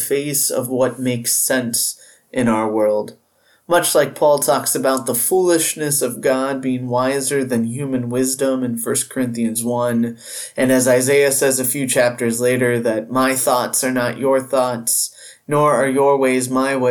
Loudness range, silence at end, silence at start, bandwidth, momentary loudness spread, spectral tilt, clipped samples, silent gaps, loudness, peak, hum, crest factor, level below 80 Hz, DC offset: 3 LU; 0 s; 0 s; 19 kHz; 6 LU; -3.5 dB/octave; under 0.1%; none; -17 LUFS; -2 dBFS; none; 14 dB; -62 dBFS; under 0.1%